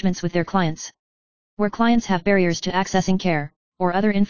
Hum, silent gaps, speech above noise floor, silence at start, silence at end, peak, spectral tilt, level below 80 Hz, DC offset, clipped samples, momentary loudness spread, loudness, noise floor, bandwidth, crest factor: none; 0.99-1.57 s, 3.56-3.72 s; over 70 dB; 0 s; 0 s; -4 dBFS; -5.5 dB/octave; -48 dBFS; 2%; under 0.1%; 7 LU; -21 LUFS; under -90 dBFS; 7.2 kHz; 16 dB